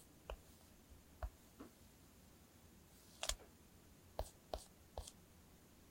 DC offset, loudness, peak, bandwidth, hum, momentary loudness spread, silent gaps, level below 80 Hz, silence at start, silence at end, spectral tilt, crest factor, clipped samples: under 0.1%; -53 LUFS; -22 dBFS; 16.5 kHz; none; 19 LU; none; -60 dBFS; 0 s; 0 s; -2.5 dB/octave; 34 dB; under 0.1%